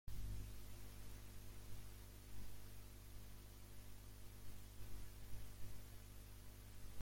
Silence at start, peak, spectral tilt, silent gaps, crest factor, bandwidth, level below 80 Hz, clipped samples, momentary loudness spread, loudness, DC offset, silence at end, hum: 0.05 s; -36 dBFS; -4.5 dB/octave; none; 14 dB; 16.5 kHz; -58 dBFS; under 0.1%; 5 LU; -59 LUFS; under 0.1%; 0 s; 50 Hz at -60 dBFS